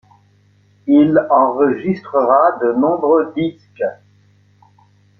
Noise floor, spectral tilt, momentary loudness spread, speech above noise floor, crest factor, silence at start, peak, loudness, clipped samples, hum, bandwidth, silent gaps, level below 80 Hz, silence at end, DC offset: -53 dBFS; -10 dB/octave; 12 LU; 39 dB; 16 dB; 0.85 s; -2 dBFS; -15 LUFS; under 0.1%; 50 Hz at -45 dBFS; 5.8 kHz; none; -62 dBFS; 1.25 s; under 0.1%